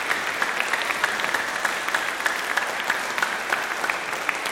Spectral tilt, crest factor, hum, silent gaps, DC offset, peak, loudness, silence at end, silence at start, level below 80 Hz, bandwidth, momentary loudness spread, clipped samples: -0.5 dB/octave; 22 dB; none; none; under 0.1%; -4 dBFS; -24 LUFS; 0 s; 0 s; -64 dBFS; 16.5 kHz; 2 LU; under 0.1%